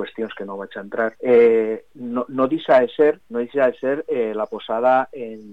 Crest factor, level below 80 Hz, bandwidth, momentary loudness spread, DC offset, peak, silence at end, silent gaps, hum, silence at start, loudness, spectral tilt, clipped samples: 14 dB; -66 dBFS; 4.8 kHz; 15 LU; 0.3%; -6 dBFS; 0 s; none; none; 0 s; -20 LUFS; -7.5 dB/octave; under 0.1%